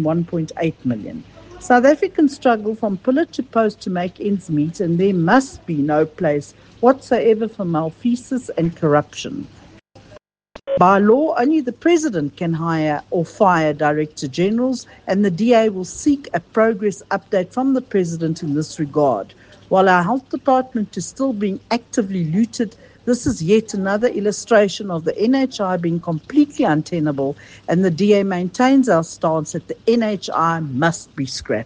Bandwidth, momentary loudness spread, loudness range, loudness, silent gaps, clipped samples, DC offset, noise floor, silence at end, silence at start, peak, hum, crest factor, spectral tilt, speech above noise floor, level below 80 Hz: 9.8 kHz; 9 LU; 3 LU; -18 LUFS; none; under 0.1%; under 0.1%; -47 dBFS; 0 s; 0 s; 0 dBFS; none; 18 dB; -6 dB/octave; 29 dB; -54 dBFS